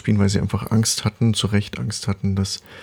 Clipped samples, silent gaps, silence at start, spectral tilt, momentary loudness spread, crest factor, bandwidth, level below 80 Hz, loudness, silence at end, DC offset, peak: under 0.1%; none; 0.05 s; -5 dB/octave; 7 LU; 14 dB; 17 kHz; -46 dBFS; -21 LUFS; 0 s; under 0.1%; -6 dBFS